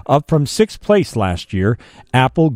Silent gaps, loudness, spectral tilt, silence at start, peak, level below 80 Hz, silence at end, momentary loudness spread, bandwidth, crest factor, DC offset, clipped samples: none; -17 LUFS; -6.5 dB/octave; 0.1 s; -2 dBFS; -40 dBFS; 0 s; 6 LU; 15.5 kHz; 14 dB; under 0.1%; under 0.1%